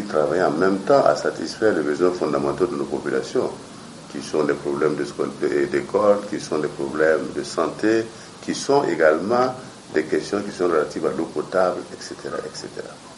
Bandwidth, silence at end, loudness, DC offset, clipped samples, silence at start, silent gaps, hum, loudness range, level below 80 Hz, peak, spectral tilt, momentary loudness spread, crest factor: 11.5 kHz; 0 s; -22 LUFS; under 0.1%; under 0.1%; 0 s; none; none; 3 LU; -58 dBFS; -2 dBFS; -5 dB/octave; 14 LU; 20 dB